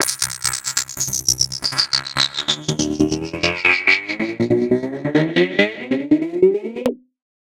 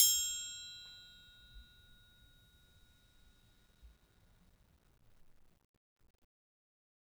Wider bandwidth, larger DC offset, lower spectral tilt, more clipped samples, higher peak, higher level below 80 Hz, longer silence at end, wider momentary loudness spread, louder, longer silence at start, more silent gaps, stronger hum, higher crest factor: second, 17 kHz vs over 20 kHz; neither; first, -3 dB/octave vs 2.5 dB/octave; neither; first, 0 dBFS vs -12 dBFS; first, -48 dBFS vs -68 dBFS; second, 0.65 s vs 3.2 s; second, 6 LU vs 28 LU; first, -18 LUFS vs -35 LUFS; about the same, 0 s vs 0 s; neither; neither; second, 20 dB vs 32 dB